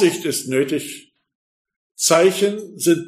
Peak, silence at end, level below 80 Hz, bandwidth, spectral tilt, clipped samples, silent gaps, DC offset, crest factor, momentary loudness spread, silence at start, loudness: -2 dBFS; 0 s; -70 dBFS; 15.5 kHz; -3.5 dB/octave; under 0.1%; 1.35-1.65 s, 1.76-1.90 s; under 0.1%; 18 dB; 12 LU; 0 s; -18 LUFS